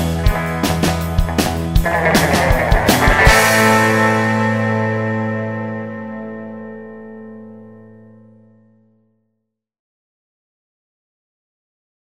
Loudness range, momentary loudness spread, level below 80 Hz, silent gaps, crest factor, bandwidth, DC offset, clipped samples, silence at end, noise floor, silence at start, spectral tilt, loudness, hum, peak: 19 LU; 22 LU; -26 dBFS; none; 18 dB; 16.5 kHz; under 0.1%; under 0.1%; 4.25 s; -74 dBFS; 0 s; -4.5 dB/octave; -15 LUFS; none; 0 dBFS